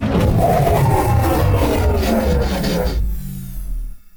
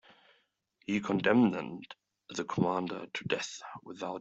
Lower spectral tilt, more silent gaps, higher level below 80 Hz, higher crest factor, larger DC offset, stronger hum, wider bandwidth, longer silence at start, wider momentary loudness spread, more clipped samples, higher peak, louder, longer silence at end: about the same, -6.5 dB/octave vs -5.5 dB/octave; neither; first, -22 dBFS vs -72 dBFS; second, 14 dB vs 22 dB; neither; neither; first, 19.5 kHz vs 8 kHz; second, 0 s vs 0.9 s; second, 15 LU vs 20 LU; neither; first, -2 dBFS vs -12 dBFS; first, -17 LUFS vs -32 LUFS; about the same, 0 s vs 0 s